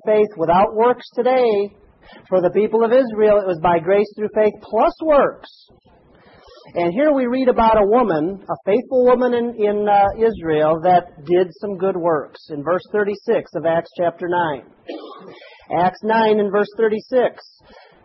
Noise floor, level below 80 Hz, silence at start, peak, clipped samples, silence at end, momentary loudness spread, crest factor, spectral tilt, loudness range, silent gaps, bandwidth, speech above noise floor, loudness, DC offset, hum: -49 dBFS; -48 dBFS; 0.05 s; -2 dBFS; under 0.1%; 0.7 s; 8 LU; 14 dB; -9 dB/octave; 4 LU; none; 6 kHz; 31 dB; -18 LUFS; under 0.1%; none